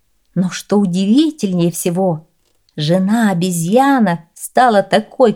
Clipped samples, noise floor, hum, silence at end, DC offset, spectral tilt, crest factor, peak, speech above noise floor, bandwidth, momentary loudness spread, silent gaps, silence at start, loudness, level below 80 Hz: under 0.1%; -45 dBFS; none; 0 s; 0.1%; -5.5 dB/octave; 14 dB; 0 dBFS; 32 dB; 17.5 kHz; 9 LU; none; 0.35 s; -15 LUFS; -60 dBFS